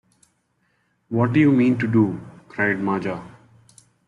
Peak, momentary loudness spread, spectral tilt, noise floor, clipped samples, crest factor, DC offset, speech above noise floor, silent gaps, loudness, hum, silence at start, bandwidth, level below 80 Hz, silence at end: -6 dBFS; 17 LU; -8.5 dB/octave; -68 dBFS; under 0.1%; 16 dB; under 0.1%; 49 dB; none; -20 LUFS; none; 1.1 s; 11 kHz; -60 dBFS; 0.8 s